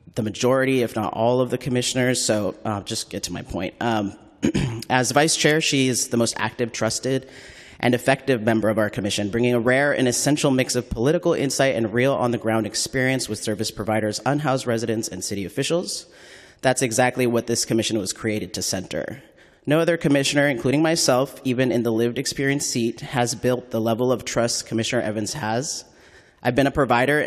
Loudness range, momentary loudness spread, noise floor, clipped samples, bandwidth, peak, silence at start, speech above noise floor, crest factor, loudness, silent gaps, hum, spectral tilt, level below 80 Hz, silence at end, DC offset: 3 LU; 8 LU; -51 dBFS; under 0.1%; 14.5 kHz; -2 dBFS; 0.15 s; 29 dB; 20 dB; -22 LUFS; none; none; -4 dB/octave; -50 dBFS; 0 s; under 0.1%